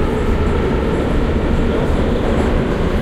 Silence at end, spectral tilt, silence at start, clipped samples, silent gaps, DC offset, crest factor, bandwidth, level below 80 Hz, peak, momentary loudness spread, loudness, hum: 0 s; -7.5 dB/octave; 0 s; under 0.1%; none; under 0.1%; 10 dB; 11.5 kHz; -20 dBFS; -4 dBFS; 1 LU; -17 LUFS; none